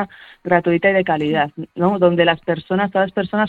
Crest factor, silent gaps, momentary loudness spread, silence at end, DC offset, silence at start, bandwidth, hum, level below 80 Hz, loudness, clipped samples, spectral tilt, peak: 16 dB; none; 7 LU; 0 s; under 0.1%; 0 s; 4.6 kHz; none; -54 dBFS; -17 LUFS; under 0.1%; -8.5 dB/octave; 0 dBFS